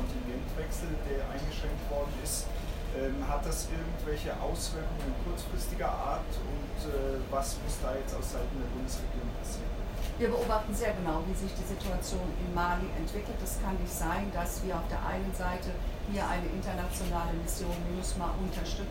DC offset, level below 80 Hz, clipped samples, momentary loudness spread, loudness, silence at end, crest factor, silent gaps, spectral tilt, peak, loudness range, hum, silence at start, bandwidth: under 0.1%; -36 dBFS; under 0.1%; 5 LU; -35 LUFS; 0 s; 16 dB; none; -5 dB/octave; -16 dBFS; 2 LU; none; 0 s; 16 kHz